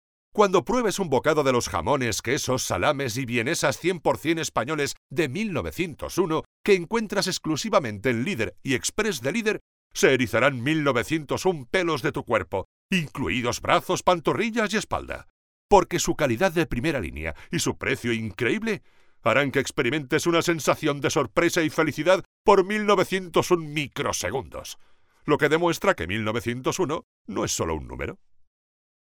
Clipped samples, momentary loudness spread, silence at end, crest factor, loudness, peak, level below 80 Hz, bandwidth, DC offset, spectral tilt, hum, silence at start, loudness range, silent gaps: under 0.1%; 9 LU; 0.95 s; 22 dB; -24 LUFS; -4 dBFS; -48 dBFS; over 20 kHz; under 0.1%; -4.5 dB/octave; none; 0.35 s; 3 LU; 4.97-5.10 s, 6.46-6.64 s, 9.61-9.90 s, 12.65-12.89 s, 15.30-15.69 s, 22.25-22.45 s, 27.04-27.25 s